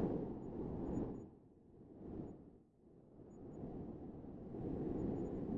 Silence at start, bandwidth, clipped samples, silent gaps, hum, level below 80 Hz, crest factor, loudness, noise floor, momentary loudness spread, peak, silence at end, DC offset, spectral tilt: 0 s; 7.2 kHz; under 0.1%; none; none; -60 dBFS; 18 dB; -47 LUFS; -66 dBFS; 21 LU; -28 dBFS; 0 s; under 0.1%; -11 dB/octave